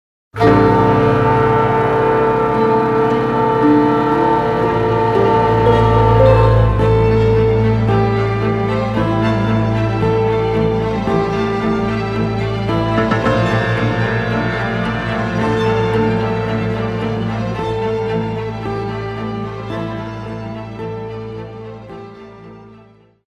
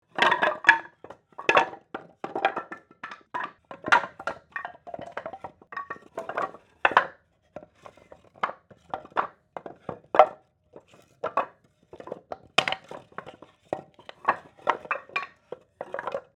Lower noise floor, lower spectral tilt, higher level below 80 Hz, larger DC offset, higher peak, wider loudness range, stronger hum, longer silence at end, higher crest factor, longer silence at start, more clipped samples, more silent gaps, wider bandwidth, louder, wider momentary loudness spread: second, -46 dBFS vs -54 dBFS; first, -8 dB/octave vs -3 dB/octave; first, -30 dBFS vs -72 dBFS; neither; about the same, 0 dBFS vs 0 dBFS; first, 11 LU vs 5 LU; neither; first, 0.55 s vs 0.15 s; second, 14 dB vs 28 dB; first, 0.35 s vs 0.15 s; neither; neither; second, 8.2 kHz vs 13 kHz; first, -15 LUFS vs -27 LUFS; second, 14 LU vs 21 LU